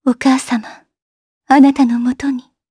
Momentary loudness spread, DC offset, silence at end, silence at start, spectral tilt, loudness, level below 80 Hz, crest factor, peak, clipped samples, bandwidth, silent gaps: 12 LU; under 0.1%; 0.3 s; 0.05 s; -4 dB/octave; -14 LUFS; -54 dBFS; 14 dB; 0 dBFS; under 0.1%; 11 kHz; 1.02-1.41 s